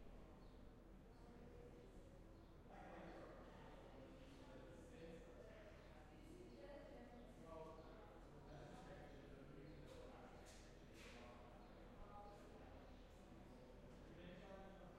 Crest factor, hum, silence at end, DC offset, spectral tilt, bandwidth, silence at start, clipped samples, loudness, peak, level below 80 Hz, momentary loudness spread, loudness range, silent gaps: 14 dB; none; 0 s; under 0.1%; -6 dB/octave; 13 kHz; 0 s; under 0.1%; -62 LUFS; -46 dBFS; -66 dBFS; 5 LU; 2 LU; none